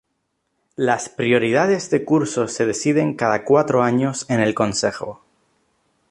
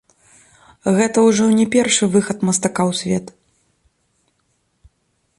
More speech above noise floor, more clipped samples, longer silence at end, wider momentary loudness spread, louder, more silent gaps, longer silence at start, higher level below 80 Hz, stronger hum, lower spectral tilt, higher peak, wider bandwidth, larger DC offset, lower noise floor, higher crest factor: about the same, 54 dB vs 51 dB; neither; second, 0.95 s vs 2.1 s; about the same, 7 LU vs 8 LU; second, -19 LUFS vs -16 LUFS; neither; about the same, 0.8 s vs 0.85 s; about the same, -58 dBFS vs -56 dBFS; neither; about the same, -5 dB/octave vs -4.5 dB/octave; about the same, -2 dBFS vs -2 dBFS; about the same, 11.5 kHz vs 11.5 kHz; neither; first, -73 dBFS vs -67 dBFS; about the same, 18 dB vs 16 dB